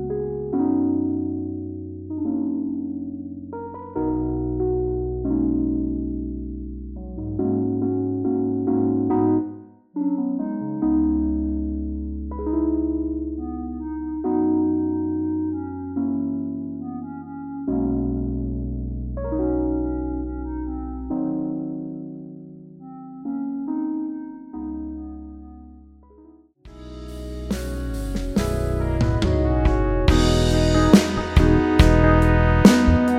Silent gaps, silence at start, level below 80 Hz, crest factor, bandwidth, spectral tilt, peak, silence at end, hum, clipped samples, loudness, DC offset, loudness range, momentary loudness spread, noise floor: none; 0 s; -30 dBFS; 22 dB; 15.5 kHz; -7 dB/octave; 0 dBFS; 0 s; none; under 0.1%; -23 LUFS; under 0.1%; 12 LU; 17 LU; -50 dBFS